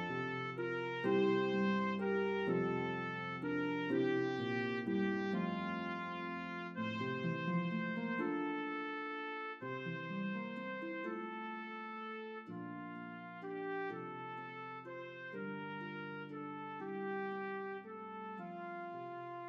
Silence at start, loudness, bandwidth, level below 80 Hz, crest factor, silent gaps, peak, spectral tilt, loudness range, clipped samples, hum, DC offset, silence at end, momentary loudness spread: 0 s; -40 LUFS; 7.2 kHz; -86 dBFS; 16 dB; none; -24 dBFS; -7.5 dB/octave; 9 LU; under 0.1%; none; under 0.1%; 0 s; 11 LU